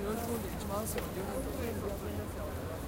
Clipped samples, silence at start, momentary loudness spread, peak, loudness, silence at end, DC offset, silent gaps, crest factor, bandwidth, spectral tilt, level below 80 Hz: under 0.1%; 0 s; 4 LU; -22 dBFS; -38 LUFS; 0 s; under 0.1%; none; 16 dB; 17 kHz; -5.5 dB/octave; -46 dBFS